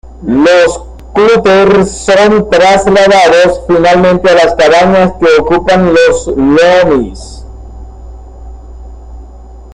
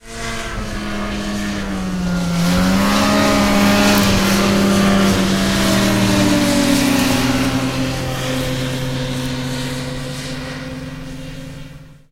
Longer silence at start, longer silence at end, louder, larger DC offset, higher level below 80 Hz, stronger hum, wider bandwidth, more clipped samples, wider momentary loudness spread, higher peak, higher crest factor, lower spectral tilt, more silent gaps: about the same, 0.05 s vs 0.05 s; second, 0 s vs 0.2 s; first, -6 LUFS vs -16 LUFS; neither; about the same, -28 dBFS vs -32 dBFS; neither; second, 11 kHz vs 16 kHz; neither; second, 6 LU vs 13 LU; about the same, 0 dBFS vs 0 dBFS; second, 8 dB vs 16 dB; about the same, -5 dB/octave vs -4.5 dB/octave; neither